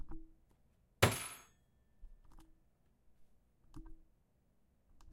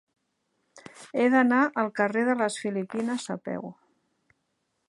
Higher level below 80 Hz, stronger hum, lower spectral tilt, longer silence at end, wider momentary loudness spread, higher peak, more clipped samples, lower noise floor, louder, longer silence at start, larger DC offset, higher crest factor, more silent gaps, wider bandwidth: first, -60 dBFS vs -80 dBFS; neither; about the same, -4 dB/octave vs -5 dB/octave; second, 0 s vs 1.15 s; first, 26 LU vs 15 LU; second, -12 dBFS vs -8 dBFS; neither; about the same, -74 dBFS vs -77 dBFS; second, -36 LUFS vs -26 LUFS; second, 0 s vs 0.75 s; neither; first, 34 dB vs 20 dB; neither; first, 16 kHz vs 11.5 kHz